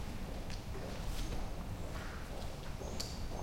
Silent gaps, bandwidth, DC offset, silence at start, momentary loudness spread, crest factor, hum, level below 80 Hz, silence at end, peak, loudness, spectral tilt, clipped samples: none; 16.5 kHz; under 0.1%; 0 s; 3 LU; 20 dB; none; -44 dBFS; 0 s; -22 dBFS; -44 LUFS; -4.5 dB/octave; under 0.1%